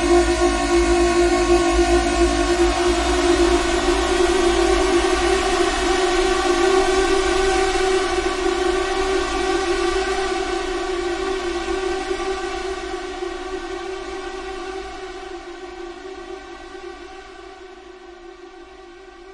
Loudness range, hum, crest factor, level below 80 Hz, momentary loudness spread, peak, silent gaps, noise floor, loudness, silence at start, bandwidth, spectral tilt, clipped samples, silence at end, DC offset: 17 LU; none; 16 dB; -32 dBFS; 19 LU; -4 dBFS; none; -41 dBFS; -19 LUFS; 0 s; 11.5 kHz; -4 dB/octave; under 0.1%; 0 s; under 0.1%